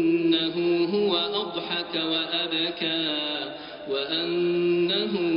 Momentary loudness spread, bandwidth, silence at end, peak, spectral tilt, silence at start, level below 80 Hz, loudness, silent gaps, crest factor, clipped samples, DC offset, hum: 6 LU; 5.2 kHz; 0 s; -10 dBFS; -2.5 dB/octave; 0 s; -68 dBFS; -25 LUFS; none; 14 dB; under 0.1%; under 0.1%; none